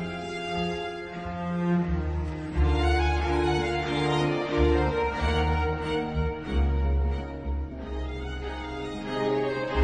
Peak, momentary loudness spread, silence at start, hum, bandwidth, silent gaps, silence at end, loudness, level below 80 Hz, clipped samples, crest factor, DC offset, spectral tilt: -10 dBFS; 10 LU; 0 s; none; 9.4 kHz; none; 0 s; -28 LUFS; -32 dBFS; under 0.1%; 16 dB; under 0.1%; -7 dB/octave